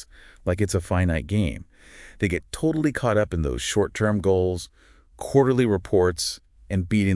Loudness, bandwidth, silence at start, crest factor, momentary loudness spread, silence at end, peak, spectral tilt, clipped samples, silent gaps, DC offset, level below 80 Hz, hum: -24 LUFS; 12 kHz; 0 s; 18 dB; 9 LU; 0 s; -6 dBFS; -6 dB/octave; under 0.1%; none; under 0.1%; -42 dBFS; none